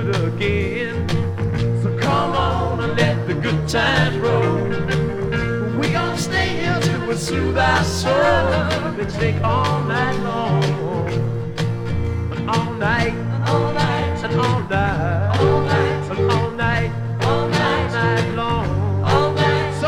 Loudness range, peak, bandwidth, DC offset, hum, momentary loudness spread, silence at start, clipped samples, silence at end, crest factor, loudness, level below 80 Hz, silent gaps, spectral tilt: 2 LU; -2 dBFS; 14.5 kHz; under 0.1%; none; 5 LU; 0 s; under 0.1%; 0 s; 16 dB; -19 LUFS; -36 dBFS; none; -6 dB/octave